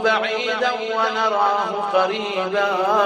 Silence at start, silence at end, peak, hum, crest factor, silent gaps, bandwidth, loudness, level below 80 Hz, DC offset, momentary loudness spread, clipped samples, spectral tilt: 0 s; 0 s; -4 dBFS; none; 16 dB; none; 14 kHz; -20 LUFS; -66 dBFS; under 0.1%; 3 LU; under 0.1%; -3 dB/octave